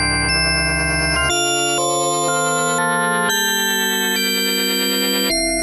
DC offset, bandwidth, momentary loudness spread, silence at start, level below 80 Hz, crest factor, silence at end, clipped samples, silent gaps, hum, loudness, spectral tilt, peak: under 0.1%; 13.5 kHz; 1 LU; 0 s; -34 dBFS; 12 dB; 0 s; under 0.1%; none; none; -16 LUFS; -2 dB/octave; -6 dBFS